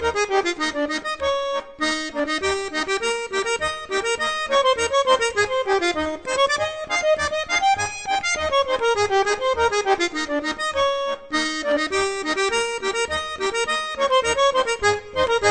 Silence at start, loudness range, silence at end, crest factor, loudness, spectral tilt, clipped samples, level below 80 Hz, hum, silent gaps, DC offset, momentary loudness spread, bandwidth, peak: 0 s; 3 LU; 0 s; 18 dB; -21 LUFS; -2 dB/octave; under 0.1%; -48 dBFS; none; none; under 0.1%; 5 LU; 9.4 kHz; -4 dBFS